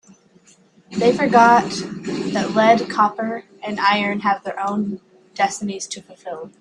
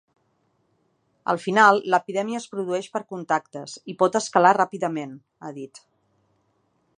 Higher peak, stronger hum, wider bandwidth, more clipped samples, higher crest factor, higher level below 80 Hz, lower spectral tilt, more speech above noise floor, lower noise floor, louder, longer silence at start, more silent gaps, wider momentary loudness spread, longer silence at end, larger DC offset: about the same, 0 dBFS vs -2 dBFS; neither; about the same, 11 kHz vs 11 kHz; neither; about the same, 18 dB vs 22 dB; first, -62 dBFS vs -78 dBFS; about the same, -4.5 dB/octave vs -4.5 dB/octave; second, 35 dB vs 46 dB; second, -53 dBFS vs -69 dBFS; first, -19 LUFS vs -22 LUFS; second, 0.9 s vs 1.25 s; neither; second, 17 LU vs 21 LU; second, 0.1 s vs 1.3 s; neither